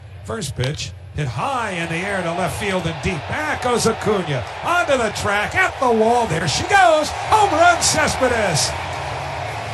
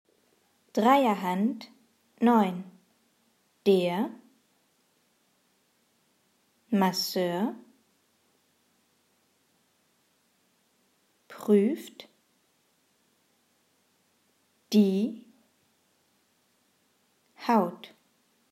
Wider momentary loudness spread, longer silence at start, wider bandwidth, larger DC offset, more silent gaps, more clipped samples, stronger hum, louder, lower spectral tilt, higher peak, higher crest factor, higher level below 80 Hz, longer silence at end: second, 12 LU vs 25 LU; second, 0 s vs 0.75 s; second, 12.5 kHz vs 15.5 kHz; neither; neither; neither; neither; first, -19 LUFS vs -27 LUFS; second, -3.5 dB/octave vs -6 dB/octave; first, -2 dBFS vs -10 dBFS; second, 16 dB vs 22 dB; first, -42 dBFS vs -86 dBFS; second, 0 s vs 0.65 s